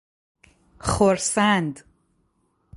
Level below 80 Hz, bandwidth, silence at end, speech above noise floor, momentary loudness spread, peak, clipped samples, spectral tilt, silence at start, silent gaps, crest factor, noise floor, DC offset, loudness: -46 dBFS; 11.5 kHz; 0 s; 47 dB; 12 LU; -4 dBFS; under 0.1%; -4 dB/octave; 0.85 s; none; 20 dB; -68 dBFS; under 0.1%; -21 LUFS